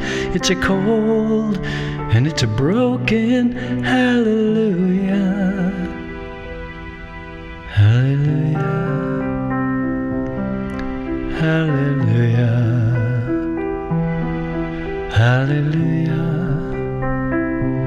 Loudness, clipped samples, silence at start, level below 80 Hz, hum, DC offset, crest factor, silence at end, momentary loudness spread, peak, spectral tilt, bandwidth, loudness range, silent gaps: -18 LUFS; under 0.1%; 0 s; -36 dBFS; none; under 0.1%; 14 dB; 0 s; 10 LU; -4 dBFS; -7 dB/octave; 9.4 kHz; 4 LU; none